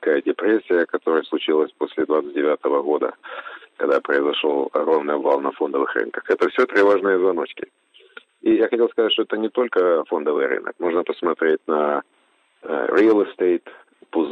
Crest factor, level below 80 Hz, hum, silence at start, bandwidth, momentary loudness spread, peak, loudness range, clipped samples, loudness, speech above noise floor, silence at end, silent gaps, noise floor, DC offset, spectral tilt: 14 dB; -76 dBFS; none; 0 s; 6.4 kHz; 9 LU; -6 dBFS; 2 LU; under 0.1%; -20 LUFS; 41 dB; 0 s; none; -61 dBFS; under 0.1%; -5.5 dB/octave